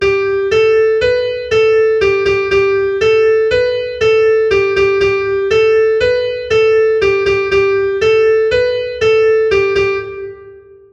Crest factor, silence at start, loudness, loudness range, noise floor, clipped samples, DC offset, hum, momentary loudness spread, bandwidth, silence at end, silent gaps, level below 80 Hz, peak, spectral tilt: 10 dB; 0 s; -12 LUFS; 1 LU; -38 dBFS; under 0.1%; under 0.1%; none; 4 LU; 8 kHz; 0.35 s; none; -40 dBFS; -2 dBFS; -5 dB/octave